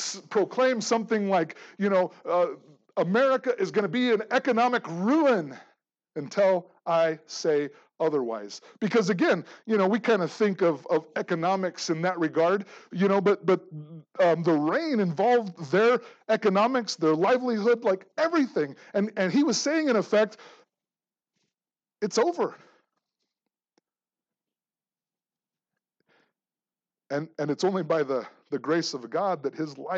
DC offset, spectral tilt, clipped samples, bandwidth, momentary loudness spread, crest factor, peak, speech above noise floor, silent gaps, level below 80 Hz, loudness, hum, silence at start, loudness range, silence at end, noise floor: under 0.1%; -5 dB/octave; under 0.1%; 8.2 kHz; 9 LU; 16 dB; -10 dBFS; over 65 dB; none; under -90 dBFS; -26 LUFS; none; 0 s; 9 LU; 0 s; under -90 dBFS